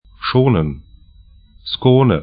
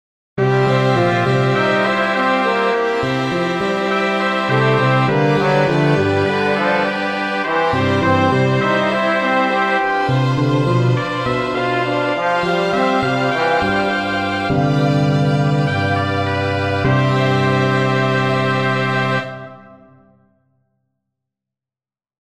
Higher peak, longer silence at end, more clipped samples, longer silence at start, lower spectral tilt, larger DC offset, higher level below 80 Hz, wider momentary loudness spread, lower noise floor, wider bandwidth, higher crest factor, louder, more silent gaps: about the same, 0 dBFS vs 0 dBFS; second, 0 s vs 2.5 s; neither; second, 0.2 s vs 0.35 s; first, -12.5 dB/octave vs -6.5 dB/octave; neither; first, -38 dBFS vs -48 dBFS; first, 18 LU vs 4 LU; second, -46 dBFS vs under -90 dBFS; second, 5 kHz vs 9.6 kHz; about the same, 16 dB vs 16 dB; about the same, -16 LUFS vs -16 LUFS; neither